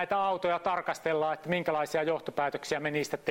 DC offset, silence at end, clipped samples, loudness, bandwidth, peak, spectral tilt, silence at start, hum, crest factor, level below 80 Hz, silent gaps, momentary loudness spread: under 0.1%; 0 s; under 0.1%; -31 LUFS; 16.5 kHz; -14 dBFS; -4.5 dB/octave; 0 s; none; 16 dB; -68 dBFS; none; 3 LU